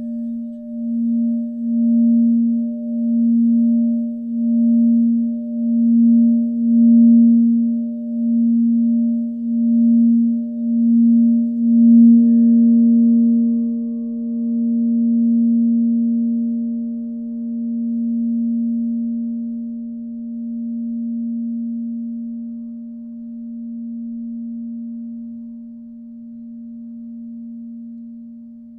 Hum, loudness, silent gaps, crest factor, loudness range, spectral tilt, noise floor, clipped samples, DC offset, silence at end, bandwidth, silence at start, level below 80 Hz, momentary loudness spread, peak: none; -17 LUFS; none; 12 dB; 17 LU; -14 dB/octave; -37 dBFS; under 0.1%; under 0.1%; 0 s; 0.6 kHz; 0 s; -64 dBFS; 20 LU; -4 dBFS